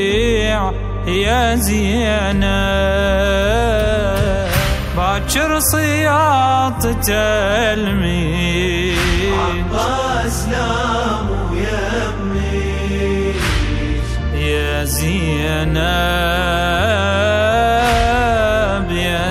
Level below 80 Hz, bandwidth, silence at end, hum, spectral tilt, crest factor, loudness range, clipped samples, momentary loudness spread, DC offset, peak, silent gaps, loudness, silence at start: -22 dBFS; 15.5 kHz; 0 s; none; -4.5 dB/octave; 14 dB; 4 LU; under 0.1%; 5 LU; under 0.1%; -2 dBFS; none; -16 LUFS; 0 s